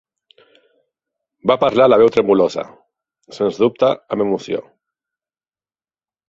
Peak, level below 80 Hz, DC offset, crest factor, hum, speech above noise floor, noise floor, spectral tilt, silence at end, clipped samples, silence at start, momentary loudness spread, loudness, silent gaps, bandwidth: -2 dBFS; -58 dBFS; under 0.1%; 18 dB; none; over 75 dB; under -90 dBFS; -6.5 dB/octave; 1.7 s; under 0.1%; 1.45 s; 14 LU; -16 LUFS; none; 7.6 kHz